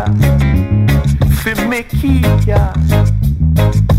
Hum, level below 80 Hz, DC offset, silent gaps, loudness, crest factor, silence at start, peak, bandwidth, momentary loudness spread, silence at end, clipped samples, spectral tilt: none; -16 dBFS; 0.7%; none; -13 LUFS; 10 dB; 0 s; 0 dBFS; 16 kHz; 3 LU; 0 s; under 0.1%; -7 dB/octave